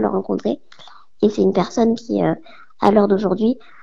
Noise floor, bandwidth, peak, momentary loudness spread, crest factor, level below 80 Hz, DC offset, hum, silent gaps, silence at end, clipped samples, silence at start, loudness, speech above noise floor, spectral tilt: -46 dBFS; 7.6 kHz; 0 dBFS; 7 LU; 18 dB; -52 dBFS; 0.9%; none; none; 0.25 s; under 0.1%; 0 s; -19 LUFS; 28 dB; -7.5 dB/octave